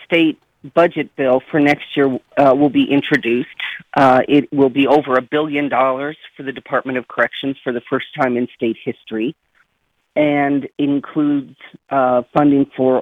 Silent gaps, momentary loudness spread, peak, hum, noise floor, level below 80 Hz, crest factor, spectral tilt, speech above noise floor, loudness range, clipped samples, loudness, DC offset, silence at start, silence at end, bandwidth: none; 11 LU; -2 dBFS; none; -67 dBFS; -58 dBFS; 14 dB; -7.5 dB/octave; 51 dB; 6 LU; under 0.1%; -17 LUFS; under 0.1%; 0 s; 0 s; 6.8 kHz